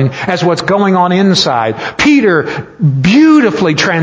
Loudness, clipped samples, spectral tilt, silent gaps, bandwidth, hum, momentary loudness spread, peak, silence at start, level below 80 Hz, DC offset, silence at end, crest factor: -10 LUFS; 0.1%; -5.5 dB/octave; none; 8 kHz; none; 7 LU; 0 dBFS; 0 s; -44 dBFS; under 0.1%; 0 s; 10 dB